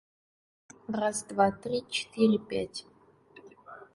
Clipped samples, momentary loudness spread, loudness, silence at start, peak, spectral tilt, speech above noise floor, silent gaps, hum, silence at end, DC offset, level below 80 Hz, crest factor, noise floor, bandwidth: under 0.1%; 20 LU; -30 LUFS; 0.9 s; -10 dBFS; -4.5 dB/octave; 28 dB; none; none; 0.1 s; under 0.1%; -66 dBFS; 22 dB; -57 dBFS; 11.5 kHz